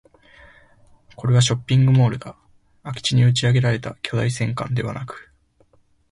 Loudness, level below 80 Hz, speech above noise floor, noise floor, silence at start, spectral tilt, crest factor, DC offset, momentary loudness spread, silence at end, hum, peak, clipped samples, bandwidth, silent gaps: -20 LUFS; -50 dBFS; 39 dB; -58 dBFS; 1.2 s; -5.5 dB/octave; 16 dB; under 0.1%; 17 LU; 0.9 s; none; -4 dBFS; under 0.1%; 11.5 kHz; none